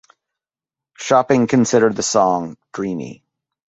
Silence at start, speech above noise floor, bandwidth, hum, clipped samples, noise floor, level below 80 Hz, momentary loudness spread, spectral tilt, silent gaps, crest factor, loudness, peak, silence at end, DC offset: 1 s; 72 dB; 8.4 kHz; none; under 0.1%; -89 dBFS; -58 dBFS; 15 LU; -4.5 dB/octave; none; 18 dB; -17 LUFS; 0 dBFS; 0.65 s; under 0.1%